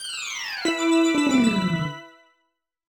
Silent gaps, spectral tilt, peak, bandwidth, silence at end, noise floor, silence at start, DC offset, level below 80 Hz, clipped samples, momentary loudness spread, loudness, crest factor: none; -4.5 dB/octave; -8 dBFS; 19 kHz; 0.9 s; -74 dBFS; 0 s; under 0.1%; -58 dBFS; under 0.1%; 10 LU; -22 LUFS; 16 dB